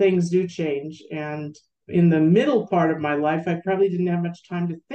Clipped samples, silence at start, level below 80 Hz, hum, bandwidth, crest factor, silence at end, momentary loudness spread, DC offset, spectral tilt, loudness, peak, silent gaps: under 0.1%; 0 s; -64 dBFS; none; 8.4 kHz; 14 dB; 0 s; 13 LU; under 0.1%; -8 dB/octave; -22 LUFS; -8 dBFS; none